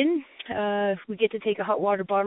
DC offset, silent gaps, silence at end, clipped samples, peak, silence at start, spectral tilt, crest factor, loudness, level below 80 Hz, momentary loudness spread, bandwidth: under 0.1%; none; 0 s; under 0.1%; -10 dBFS; 0 s; -10 dB/octave; 16 dB; -27 LUFS; -70 dBFS; 5 LU; 4 kHz